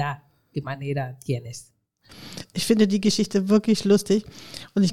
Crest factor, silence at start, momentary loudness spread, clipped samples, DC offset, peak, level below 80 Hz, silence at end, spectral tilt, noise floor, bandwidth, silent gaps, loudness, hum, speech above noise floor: 18 dB; 0 s; 19 LU; under 0.1%; under 0.1%; -6 dBFS; -58 dBFS; 0 s; -5.5 dB/octave; -50 dBFS; 14.5 kHz; none; -23 LUFS; none; 27 dB